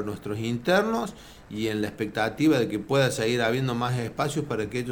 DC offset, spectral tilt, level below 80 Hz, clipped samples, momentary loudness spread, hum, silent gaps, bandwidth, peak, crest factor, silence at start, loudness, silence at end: under 0.1%; -5.5 dB/octave; -54 dBFS; under 0.1%; 8 LU; none; none; 19.5 kHz; -10 dBFS; 16 dB; 0 s; -26 LUFS; 0 s